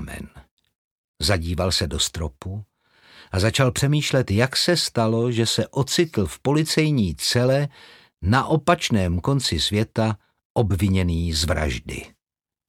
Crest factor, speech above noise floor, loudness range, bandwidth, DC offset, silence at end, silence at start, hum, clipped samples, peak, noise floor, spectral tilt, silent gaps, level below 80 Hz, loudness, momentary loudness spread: 20 dB; over 69 dB; 3 LU; 16.5 kHz; under 0.1%; 0.6 s; 0 s; none; under 0.1%; -2 dBFS; under -90 dBFS; -5 dB/octave; 0.51-0.57 s, 0.75-1.14 s, 10.45-10.55 s; -38 dBFS; -21 LUFS; 11 LU